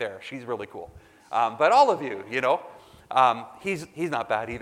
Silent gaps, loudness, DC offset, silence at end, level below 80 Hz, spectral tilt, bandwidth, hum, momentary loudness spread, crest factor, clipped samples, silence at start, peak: none; -25 LUFS; under 0.1%; 0 s; -60 dBFS; -4.5 dB/octave; 14.5 kHz; none; 14 LU; 20 dB; under 0.1%; 0 s; -6 dBFS